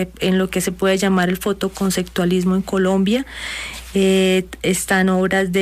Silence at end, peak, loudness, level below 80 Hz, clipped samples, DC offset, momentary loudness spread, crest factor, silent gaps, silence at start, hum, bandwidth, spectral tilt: 0 s; -6 dBFS; -18 LUFS; -42 dBFS; under 0.1%; under 0.1%; 6 LU; 12 dB; none; 0 s; none; 15.5 kHz; -5 dB/octave